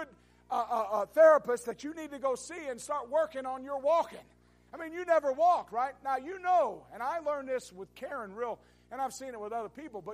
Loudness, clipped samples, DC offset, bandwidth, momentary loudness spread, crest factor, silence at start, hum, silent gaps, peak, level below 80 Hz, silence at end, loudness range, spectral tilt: -31 LUFS; under 0.1%; under 0.1%; 15 kHz; 15 LU; 20 dB; 0 s; 60 Hz at -65 dBFS; none; -12 dBFS; -70 dBFS; 0 s; 5 LU; -3.5 dB/octave